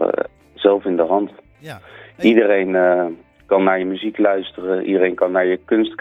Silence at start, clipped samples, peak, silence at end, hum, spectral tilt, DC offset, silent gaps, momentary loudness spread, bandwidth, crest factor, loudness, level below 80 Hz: 0 s; under 0.1%; 0 dBFS; 0.05 s; none; -7.5 dB/octave; under 0.1%; none; 14 LU; 6 kHz; 18 dB; -17 LUFS; -58 dBFS